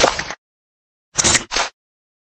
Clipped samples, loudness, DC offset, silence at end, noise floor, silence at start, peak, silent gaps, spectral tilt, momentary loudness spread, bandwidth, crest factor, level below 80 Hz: under 0.1%; -17 LUFS; under 0.1%; 0.6 s; under -90 dBFS; 0 s; 0 dBFS; 0.38-1.12 s; -1 dB/octave; 16 LU; 16 kHz; 22 dB; -42 dBFS